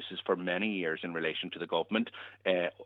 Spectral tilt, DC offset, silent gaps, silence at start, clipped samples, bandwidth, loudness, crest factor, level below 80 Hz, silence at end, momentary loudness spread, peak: -7.5 dB/octave; under 0.1%; none; 0 s; under 0.1%; 4.6 kHz; -33 LUFS; 18 dB; -82 dBFS; 0 s; 5 LU; -14 dBFS